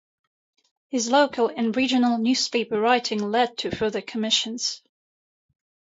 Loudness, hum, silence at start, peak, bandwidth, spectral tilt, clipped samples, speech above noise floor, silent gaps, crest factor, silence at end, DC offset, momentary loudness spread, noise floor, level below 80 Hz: -23 LUFS; none; 0.9 s; -6 dBFS; 8 kHz; -3 dB/octave; under 0.1%; over 67 dB; none; 20 dB; 1.05 s; under 0.1%; 7 LU; under -90 dBFS; -62 dBFS